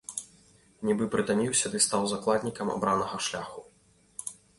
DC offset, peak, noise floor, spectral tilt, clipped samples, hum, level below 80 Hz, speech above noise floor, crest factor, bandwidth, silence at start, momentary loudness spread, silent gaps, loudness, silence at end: under 0.1%; -12 dBFS; -63 dBFS; -3 dB/octave; under 0.1%; none; -62 dBFS; 35 dB; 20 dB; 11.5 kHz; 0.1 s; 14 LU; none; -28 LUFS; 0.25 s